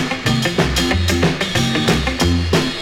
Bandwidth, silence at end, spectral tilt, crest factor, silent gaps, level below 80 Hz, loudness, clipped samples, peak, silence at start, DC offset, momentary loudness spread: 17.5 kHz; 0 s; -4.5 dB/octave; 16 dB; none; -28 dBFS; -17 LUFS; under 0.1%; -2 dBFS; 0 s; under 0.1%; 2 LU